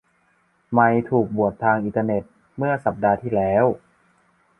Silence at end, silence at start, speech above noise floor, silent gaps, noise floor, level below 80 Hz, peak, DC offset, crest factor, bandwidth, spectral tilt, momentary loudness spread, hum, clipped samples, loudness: 0.85 s; 0.7 s; 44 dB; none; -63 dBFS; -54 dBFS; -2 dBFS; under 0.1%; 20 dB; 3.6 kHz; -10.5 dB/octave; 9 LU; none; under 0.1%; -21 LUFS